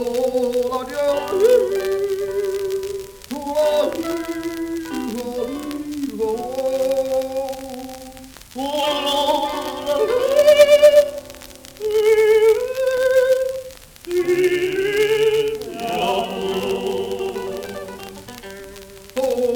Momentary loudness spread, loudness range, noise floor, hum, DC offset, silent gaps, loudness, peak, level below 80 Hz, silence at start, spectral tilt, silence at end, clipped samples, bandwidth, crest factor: 19 LU; 9 LU; -39 dBFS; none; under 0.1%; none; -19 LUFS; 0 dBFS; -50 dBFS; 0 s; -3.5 dB/octave; 0 s; under 0.1%; over 20 kHz; 18 dB